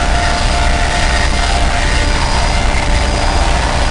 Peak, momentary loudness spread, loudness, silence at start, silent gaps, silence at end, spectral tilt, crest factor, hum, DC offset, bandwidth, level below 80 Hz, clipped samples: -4 dBFS; 1 LU; -14 LUFS; 0 s; none; 0 s; -4 dB/octave; 8 dB; none; under 0.1%; 10.5 kHz; -14 dBFS; under 0.1%